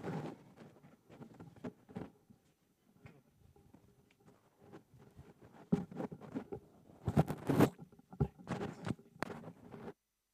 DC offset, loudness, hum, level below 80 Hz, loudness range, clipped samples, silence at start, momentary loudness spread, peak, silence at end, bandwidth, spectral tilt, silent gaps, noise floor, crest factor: under 0.1%; -40 LUFS; none; -62 dBFS; 18 LU; under 0.1%; 0 s; 26 LU; -14 dBFS; 0.4 s; 15.5 kHz; -7.5 dB/octave; none; -74 dBFS; 28 dB